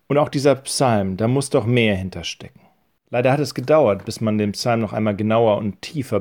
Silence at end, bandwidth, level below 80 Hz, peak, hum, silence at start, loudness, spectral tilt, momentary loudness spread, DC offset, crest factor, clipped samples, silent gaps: 0 s; 18.5 kHz; -54 dBFS; -4 dBFS; none; 0.1 s; -20 LUFS; -5.5 dB/octave; 10 LU; under 0.1%; 16 dB; under 0.1%; none